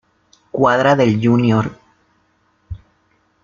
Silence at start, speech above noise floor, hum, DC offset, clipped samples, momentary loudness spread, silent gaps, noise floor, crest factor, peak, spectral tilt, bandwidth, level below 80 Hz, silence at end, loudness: 0.55 s; 47 dB; none; under 0.1%; under 0.1%; 23 LU; none; -61 dBFS; 16 dB; -2 dBFS; -7.5 dB/octave; 7.2 kHz; -48 dBFS; 0.65 s; -15 LUFS